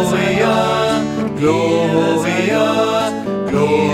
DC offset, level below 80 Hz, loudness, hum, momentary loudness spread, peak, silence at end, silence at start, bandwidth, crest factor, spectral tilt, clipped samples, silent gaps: under 0.1%; -46 dBFS; -15 LUFS; none; 4 LU; -2 dBFS; 0 s; 0 s; 16.5 kHz; 14 dB; -5.5 dB/octave; under 0.1%; none